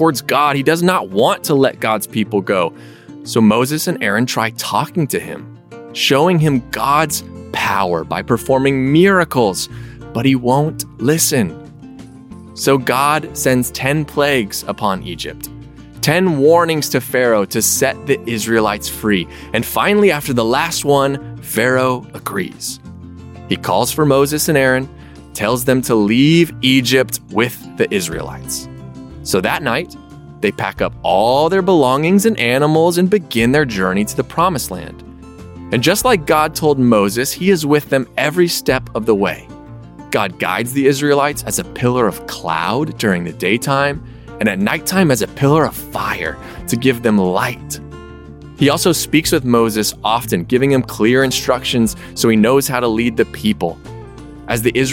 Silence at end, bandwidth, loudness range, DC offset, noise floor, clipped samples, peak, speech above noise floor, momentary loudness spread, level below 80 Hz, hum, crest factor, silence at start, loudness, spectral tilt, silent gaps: 0 s; 17 kHz; 3 LU; under 0.1%; -36 dBFS; under 0.1%; 0 dBFS; 21 dB; 13 LU; -42 dBFS; none; 16 dB; 0 s; -15 LUFS; -4.5 dB/octave; none